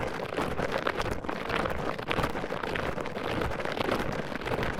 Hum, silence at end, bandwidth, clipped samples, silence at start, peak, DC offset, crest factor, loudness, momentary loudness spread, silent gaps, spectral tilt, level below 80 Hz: none; 0 s; 19 kHz; under 0.1%; 0 s; -8 dBFS; under 0.1%; 22 dB; -32 LUFS; 4 LU; none; -5.5 dB/octave; -44 dBFS